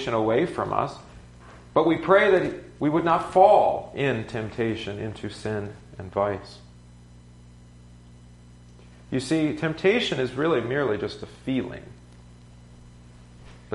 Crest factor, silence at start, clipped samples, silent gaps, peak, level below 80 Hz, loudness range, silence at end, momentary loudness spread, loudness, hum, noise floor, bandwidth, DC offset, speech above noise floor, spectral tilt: 22 dB; 0 s; under 0.1%; none; -4 dBFS; -52 dBFS; 13 LU; 0 s; 16 LU; -24 LUFS; 60 Hz at -50 dBFS; -49 dBFS; 11.5 kHz; under 0.1%; 25 dB; -6 dB/octave